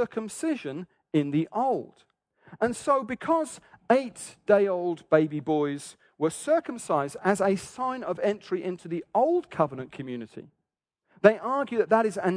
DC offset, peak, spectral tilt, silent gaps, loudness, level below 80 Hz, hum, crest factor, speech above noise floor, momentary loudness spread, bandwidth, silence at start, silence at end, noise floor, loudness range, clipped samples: under 0.1%; -2 dBFS; -6 dB/octave; none; -27 LUFS; -70 dBFS; none; 24 dB; 57 dB; 14 LU; 11 kHz; 0 s; 0 s; -84 dBFS; 3 LU; under 0.1%